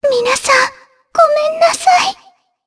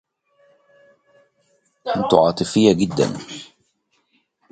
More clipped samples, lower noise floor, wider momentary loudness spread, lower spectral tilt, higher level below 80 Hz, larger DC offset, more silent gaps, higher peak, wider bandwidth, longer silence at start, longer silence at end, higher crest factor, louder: neither; second, -48 dBFS vs -67 dBFS; second, 8 LU vs 18 LU; second, 0 dB/octave vs -5.5 dB/octave; about the same, -56 dBFS vs -54 dBFS; neither; neither; about the same, 0 dBFS vs 0 dBFS; first, 11 kHz vs 9.4 kHz; second, 0 s vs 1.85 s; second, 0.55 s vs 1.1 s; second, 14 dB vs 22 dB; first, -12 LUFS vs -18 LUFS